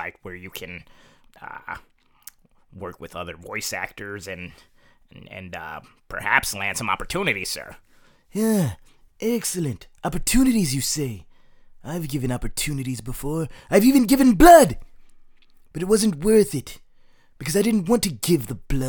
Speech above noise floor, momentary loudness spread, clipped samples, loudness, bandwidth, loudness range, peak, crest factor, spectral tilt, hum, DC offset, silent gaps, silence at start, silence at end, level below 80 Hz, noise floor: 30 dB; 21 LU; under 0.1%; -21 LUFS; 19.5 kHz; 16 LU; 0 dBFS; 22 dB; -4.5 dB/octave; none; under 0.1%; none; 0 s; 0 s; -38 dBFS; -51 dBFS